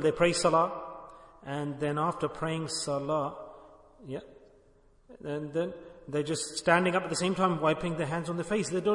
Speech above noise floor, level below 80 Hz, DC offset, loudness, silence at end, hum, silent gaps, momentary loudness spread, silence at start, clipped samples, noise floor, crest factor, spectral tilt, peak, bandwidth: 32 dB; -60 dBFS; under 0.1%; -30 LUFS; 0 s; none; none; 18 LU; 0 s; under 0.1%; -61 dBFS; 20 dB; -4.5 dB/octave; -10 dBFS; 11 kHz